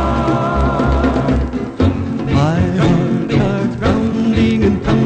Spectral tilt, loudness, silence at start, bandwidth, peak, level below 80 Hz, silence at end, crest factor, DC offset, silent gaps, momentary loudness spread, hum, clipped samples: -8 dB/octave; -15 LUFS; 0 s; 8.8 kHz; -2 dBFS; -24 dBFS; 0 s; 12 dB; under 0.1%; none; 3 LU; none; under 0.1%